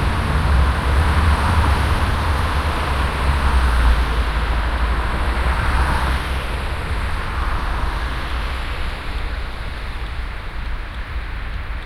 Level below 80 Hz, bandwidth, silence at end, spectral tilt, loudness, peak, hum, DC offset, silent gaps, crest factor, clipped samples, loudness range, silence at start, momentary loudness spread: -20 dBFS; 13 kHz; 0 s; -5.5 dB/octave; -21 LUFS; -4 dBFS; none; under 0.1%; none; 16 dB; under 0.1%; 9 LU; 0 s; 12 LU